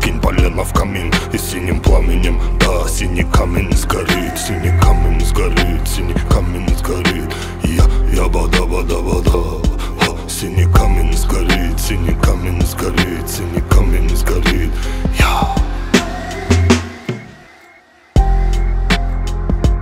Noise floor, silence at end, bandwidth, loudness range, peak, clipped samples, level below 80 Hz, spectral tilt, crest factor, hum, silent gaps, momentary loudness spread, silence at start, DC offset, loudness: -45 dBFS; 0 s; 16 kHz; 2 LU; 0 dBFS; under 0.1%; -16 dBFS; -5 dB/octave; 14 dB; none; none; 6 LU; 0 s; under 0.1%; -16 LUFS